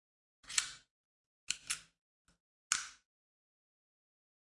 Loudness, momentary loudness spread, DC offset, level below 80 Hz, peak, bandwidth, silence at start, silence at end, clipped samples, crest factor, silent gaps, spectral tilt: -38 LUFS; 12 LU; under 0.1%; -78 dBFS; -10 dBFS; 11.5 kHz; 0.45 s; 1.55 s; under 0.1%; 36 dB; 0.91-1.47 s, 2.01-2.25 s, 2.40-2.70 s; 3 dB/octave